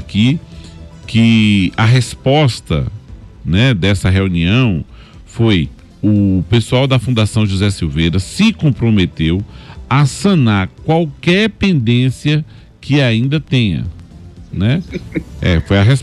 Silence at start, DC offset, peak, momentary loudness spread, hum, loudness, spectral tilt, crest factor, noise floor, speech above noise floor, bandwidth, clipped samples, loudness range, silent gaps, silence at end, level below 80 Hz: 0 s; under 0.1%; -2 dBFS; 13 LU; none; -14 LUFS; -6.5 dB/octave; 12 dB; -35 dBFS; 22 dB; 12 kHz; under 0.1%; 2 LU; none; 0 s; -32 dBFS